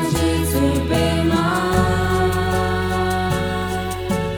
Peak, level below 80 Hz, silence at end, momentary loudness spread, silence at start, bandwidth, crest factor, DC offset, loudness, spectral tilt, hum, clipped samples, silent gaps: -2 dBFS; -30 dBFS; 0 s; 5 LU; 0 s; over 20 kHz; 16 dB; under 0.1%; -19 LUFS; -5.5 dB/octave; none; under 0.1%; none